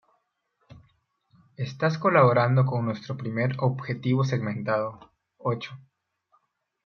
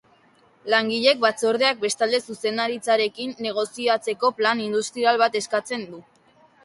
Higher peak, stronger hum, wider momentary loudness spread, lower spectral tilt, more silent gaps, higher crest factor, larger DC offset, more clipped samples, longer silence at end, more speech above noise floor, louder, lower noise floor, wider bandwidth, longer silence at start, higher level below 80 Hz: second, -8 dBFS vs -4 dBFS; neither; first, 14 LU vs 8 LU; first, -8 dB/octave vs -2.5 dB/octave; neither; about the same, 20 dB vs 18 dB; neither; neither; first, 1.05 s vs 0.65 s; first, 49 dB vs 35 dB; second, -25 LUFS vs -22 LUFS; first, -74 dBFS vs -58 dBFS; second, 6.6 kHz vs 11.5 kHz; about the same, 0.7 s vs 0.65 s; about the same, -68 dBFS vs -72 dBFS